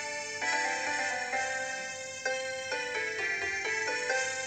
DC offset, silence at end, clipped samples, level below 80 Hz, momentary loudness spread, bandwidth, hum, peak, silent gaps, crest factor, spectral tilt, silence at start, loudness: under 0.1%; 0 s; under 0.1%; -72 dBFS; 6 LU; 19 kHz; none; -18 dBFS; none; 14 dB; -0.5 dB/octave; 0 s; -32 LUFS